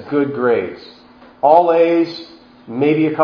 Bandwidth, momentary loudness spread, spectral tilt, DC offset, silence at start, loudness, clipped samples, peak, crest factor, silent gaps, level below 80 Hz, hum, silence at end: 5.4 kHz; 18 LU; -8.5 dB/octave; under 0.1%; 0 s; -15 LUFS; under 0.1%; 0 dBFS; 16 dB; none; -60 dBFS; none; 0 s